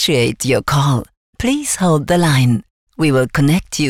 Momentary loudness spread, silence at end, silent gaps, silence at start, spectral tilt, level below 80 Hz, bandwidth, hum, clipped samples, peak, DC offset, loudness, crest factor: 5 LU; 0 s; 1.17-1.33 s, 2.70-2.87 s; 0 s; -5 dB/octave; -38 dBFS; 16.5 kHz; none; under 0.1%; -6 dBFS; under 0.1%; -15 LUFS; 10 dB